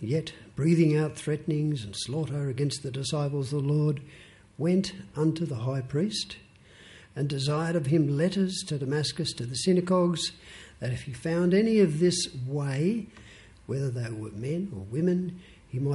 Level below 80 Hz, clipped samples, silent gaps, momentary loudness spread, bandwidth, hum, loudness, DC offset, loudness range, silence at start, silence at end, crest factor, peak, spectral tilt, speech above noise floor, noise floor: -58 dBFS; under 0.1%; none; 12 LU; 11.5 kHz; none; -28 LUFS; under 0.1%; 4 LU; 0 s; 0 s; 16 dB; -12 dBFS; -6 dB/octave; 26 dB; -53 dBFS